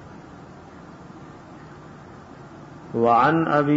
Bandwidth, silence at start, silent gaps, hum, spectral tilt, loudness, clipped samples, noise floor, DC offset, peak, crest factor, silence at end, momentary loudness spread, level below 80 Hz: 7.8 kHz; 0 s; none; none; -8 dB/octave; -19 LUFS; under 0.1%; -43 dBFS; under 0.1%; -6 dBFS; 18 dB; 0 s; 25 LU; -58 dBFS